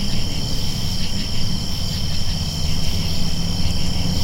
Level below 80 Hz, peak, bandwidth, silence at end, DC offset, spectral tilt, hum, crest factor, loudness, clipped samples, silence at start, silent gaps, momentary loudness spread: -24 dBFS; -6 dBFS; 16 kHz; 0 s; under 0.1%; -4.5 dB/octave; none; 12 dB; -23 LUFS; under 0.1%; 0 s; none; 1 LU